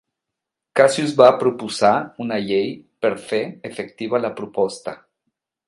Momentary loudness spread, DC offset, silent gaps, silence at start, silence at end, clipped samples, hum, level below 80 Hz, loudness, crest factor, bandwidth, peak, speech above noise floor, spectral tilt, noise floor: 16 LU; under 0.1%; none; 0.75 s; 0.7 s; under 0.1%; none; -66 dBFS; -19 LUFS; 20 dB; 11.5 kHz; 0 dBFS; 64 dB; -5 dB/octave; -83 dBFS